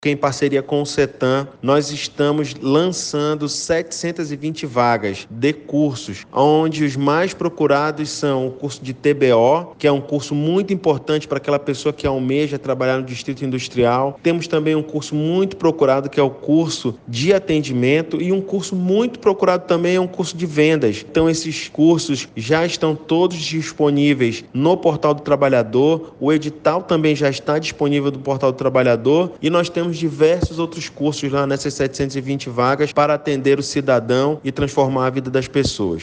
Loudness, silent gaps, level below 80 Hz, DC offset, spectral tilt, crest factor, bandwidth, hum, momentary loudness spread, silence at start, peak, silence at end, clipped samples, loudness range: -18 LUFS; none; -48 dBFS; under 0.1%; -5.5 dB/octave; 14 dB; 9.8 kHz; none; 7 LU; 0 s; -2 dBFS; 0 s; under 0.1%; 2 LU